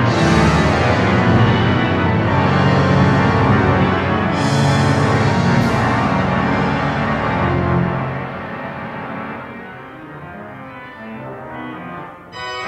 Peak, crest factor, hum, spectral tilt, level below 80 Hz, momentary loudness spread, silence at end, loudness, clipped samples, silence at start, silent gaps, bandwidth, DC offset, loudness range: -2 dBFS; 14 dB; none; -6.5 dB/octave; -36 dBFS; 19 LU; 0 s; -16 LUFS; under 0.1%; 0 s; none; 11.5 kHz; under 0.1%; 15 LU